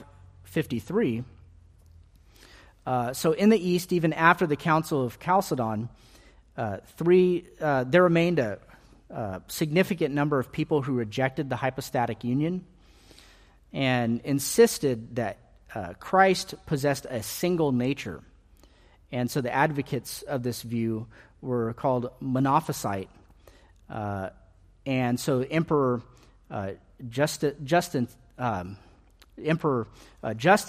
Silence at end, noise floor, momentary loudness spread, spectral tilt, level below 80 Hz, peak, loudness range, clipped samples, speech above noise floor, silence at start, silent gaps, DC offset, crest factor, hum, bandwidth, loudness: 0 s; -56 dBFS; 15 LU; -5.5 dB/octave; -58 dBFS; -4 dBFS; 5 LU; under 0.1%; 30 dB; 0 s; none; under 0.1%; 24 dB; none; 15.5 kHz; -27 LUFS